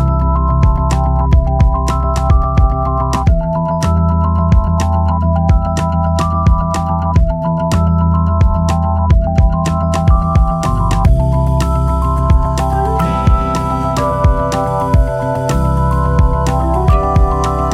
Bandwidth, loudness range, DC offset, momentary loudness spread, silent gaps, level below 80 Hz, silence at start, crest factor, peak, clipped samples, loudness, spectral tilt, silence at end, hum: 12 kHz; 1 LU; under 0.1%; 3 LU; none; -16 dBFS; 0 s; 12 dB; 0 dBFS; under 0.1%; -14 LUFS; -7.5 dB/octave; 0 s; none